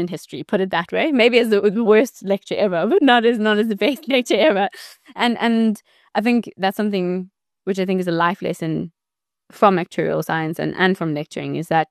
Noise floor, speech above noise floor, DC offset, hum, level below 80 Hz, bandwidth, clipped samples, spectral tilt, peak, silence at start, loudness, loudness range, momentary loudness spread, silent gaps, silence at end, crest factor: -87 dBFS; 69 dB; under 0.1%; none; -66 dBFS; 13 kHz; under 0.1%; -5.5 dB/octave; -2 dBFS; 0 s; -19 LUFS; 5 LU; 12 LU; none; 0.05 s; 18 dB